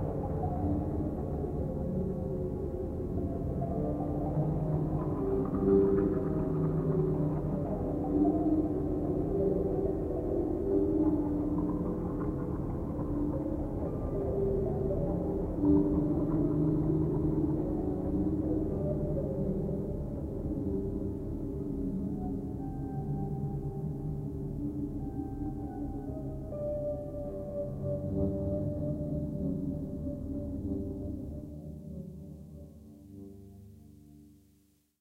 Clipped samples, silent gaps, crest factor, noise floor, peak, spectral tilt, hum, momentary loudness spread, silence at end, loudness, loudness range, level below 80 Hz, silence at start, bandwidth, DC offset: under 0.1%; none; 18 dB; -67 dBFS; -14 dBFS; -11.5 dB/octave; none; 10 LU; 0.65 s; -33 LUFS; 8 LU; -42 dBFS; 0 s; 2.8 kHz; under 0.1%